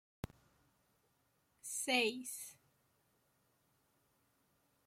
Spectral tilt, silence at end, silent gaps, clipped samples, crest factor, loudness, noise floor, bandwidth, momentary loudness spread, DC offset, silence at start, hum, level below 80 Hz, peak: -2 dB/octave; 2.35 s; none; under 0.1%; 26 dB; -38 LUFS; -79 dBFS; 16.5 kHz; 19 LU; under 0.1%; 1.65 s; none; -72 dBFS; -22 dBFS